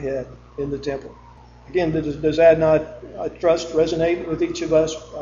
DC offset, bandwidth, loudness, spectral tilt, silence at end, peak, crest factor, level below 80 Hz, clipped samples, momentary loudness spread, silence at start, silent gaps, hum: under 0.1%; 7.6 kHz; -20 LUFS; -6 dB/octave; 0 s; -2 dBFS; 18 dB; -44 dBFS; under 0.1%; 16 LU; 0 s; none; none